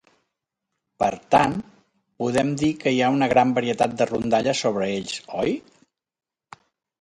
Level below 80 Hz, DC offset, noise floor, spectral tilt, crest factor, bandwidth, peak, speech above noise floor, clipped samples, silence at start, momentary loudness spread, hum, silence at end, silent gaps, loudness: -56 dBFS; under 0.1%; -90 dBFS; -5 dB/octave; 20 dB; 11.5 kHz; -4 dBFS; 68 dB; under 0.1%; 1 s; 9 LU; none; 1.4 s; none; -22 LUFS